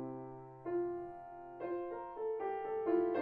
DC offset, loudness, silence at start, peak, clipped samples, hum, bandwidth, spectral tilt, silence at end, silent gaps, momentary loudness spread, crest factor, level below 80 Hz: under 0.1%; -40 LUFS; 0 s; -22 dBFS; under 0.1%; none; 4 kHz; -7 dB/octave; 0 s; none; 14 LU; 18 dB; -72 dBFS